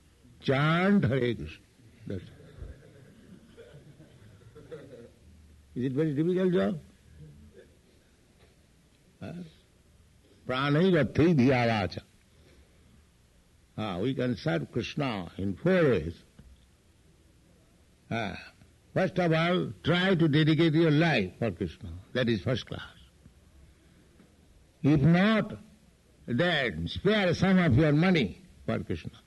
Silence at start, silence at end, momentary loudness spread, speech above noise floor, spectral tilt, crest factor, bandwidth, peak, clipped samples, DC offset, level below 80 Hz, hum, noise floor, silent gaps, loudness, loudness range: 0.45 s; 0.15 s; 21 LU; 35 dB; -7.5 dB/octave; 18 dB; 11.5 kHz; -12 dBFS; under 0.1%; under 0.1%; -54 dBFS; none; -62 dBFS; none; -27 LUFS; 11 LU